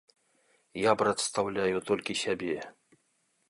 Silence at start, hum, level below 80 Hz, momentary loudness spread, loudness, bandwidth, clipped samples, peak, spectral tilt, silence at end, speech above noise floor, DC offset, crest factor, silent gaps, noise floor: 0.75 s; none; -66 dBFS; 11 LU; -30 LUFS; 11.5 kHz; under 0.1%; -10 dBFS; -3.5 dB/octave; 0.8 s; 44 dB; under 0.1%; 22 dB; none; -74 dBFS